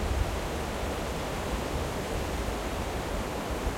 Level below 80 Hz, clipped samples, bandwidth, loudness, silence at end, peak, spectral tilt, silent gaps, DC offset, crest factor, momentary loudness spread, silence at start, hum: -36 dBFS; under 0.1%; 16.5 kHz; -33 LUFS; 0 s; -16 dBFS; -5 dB/octave; none; under 0.1%; 16 dB; 1 LU; 0 s; none